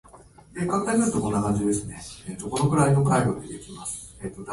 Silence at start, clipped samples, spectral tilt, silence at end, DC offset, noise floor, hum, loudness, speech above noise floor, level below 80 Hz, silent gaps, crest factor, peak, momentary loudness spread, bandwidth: 0.15 s; under 0.1%; -6 dB/octave; 0 s; under 0.1%; -50 dBFS; none; -24 LUFS; 26 dB; -48 dBFS; none; 18 dB; -8 dBFS; 17 LU; 11.5 kHz